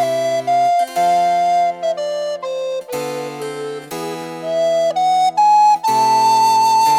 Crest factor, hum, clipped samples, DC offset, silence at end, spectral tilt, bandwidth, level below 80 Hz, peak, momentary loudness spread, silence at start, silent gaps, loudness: 10 dB; none; under 0.1%; under 0.1%; 0 s; -3 dB/octave; 16.5 kHz; -72 dBFS; -6 dBFS; 13 LU; 0 s; none; -16 LUFS